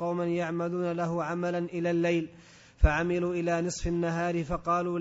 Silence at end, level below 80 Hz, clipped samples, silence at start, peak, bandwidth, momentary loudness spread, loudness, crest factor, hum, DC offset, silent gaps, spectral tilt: 0 s; -36 dBFS; under 0.1%; 0 s; -10 dBFS; 8 kHz; 4 LU; -29 LUFS; 20 dB; none; under 0.1%; none; -6.5 dB/octave